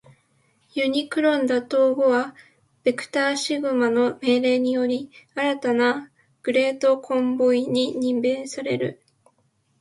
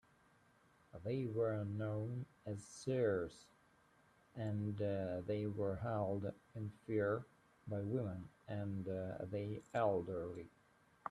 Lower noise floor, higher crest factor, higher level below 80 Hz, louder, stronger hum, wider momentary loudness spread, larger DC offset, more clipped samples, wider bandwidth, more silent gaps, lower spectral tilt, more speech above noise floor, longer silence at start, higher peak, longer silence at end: second, -67 dBFS vs -72 dBFS; about the same, 16 dB vs 18 dB; about the same, -70 dBFS vs -72 dBFS; first, -22 LUFS vs -42 LUFS; neither; second, 7 LU vs 12 LU; neither; neither; about the same, 11.5 kHz vs 11.5 kHz; neither; second, -4.5 dB/octave vs -8 dB/octave; first, 45 dB vs 30 dB; second, 0.75 s vs 0.95 s; first, -8 dBFS vs -24 dBFS; first, 0.85 s vs 0 s